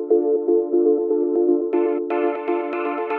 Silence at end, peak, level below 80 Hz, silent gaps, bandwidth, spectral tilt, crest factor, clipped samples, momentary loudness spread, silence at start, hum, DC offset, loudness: 0 s; -6 dBFS; -80 dBFS; none; 3.7 kHz; -7.5 dB/octave; 14 dB; under 0.1%; 5 LU; 0 s; none; under 0.1%; -20 LUFS